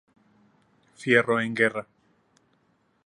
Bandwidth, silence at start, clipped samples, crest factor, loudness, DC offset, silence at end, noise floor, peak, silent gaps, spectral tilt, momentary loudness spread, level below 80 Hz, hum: 11 kHz; 1 s; under 0.1%; 22 dB; -24 LUFS; under 0.1%; 1.2 s; -68 dBFS; -6 dBFS; none; -5.5 dB/octave; 15 LU; -74 dBFS; none